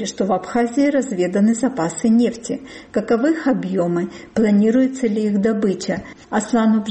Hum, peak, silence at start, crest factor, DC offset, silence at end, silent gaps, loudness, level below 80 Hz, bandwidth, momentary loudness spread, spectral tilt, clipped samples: none; -8 dBFS; 0 s; 10 dB; under 0.1%; 0 s; none; -19 LUFS; -54 dBFS; 8.8 kHz; 8 LU; -6 dB/octave; under 0.1%